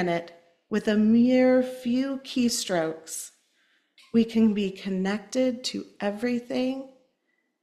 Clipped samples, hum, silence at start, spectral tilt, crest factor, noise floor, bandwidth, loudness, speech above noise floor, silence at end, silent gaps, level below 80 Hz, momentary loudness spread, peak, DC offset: under 0.1%; none; 0 s; -5 dB/octave; 16 dB; -75 dBFS; 13.5 kHz; -26 LUFS; 50 dB; 0.75 s; none; -66 dBFS; 12 LU; -10 dBFS; under 0.1%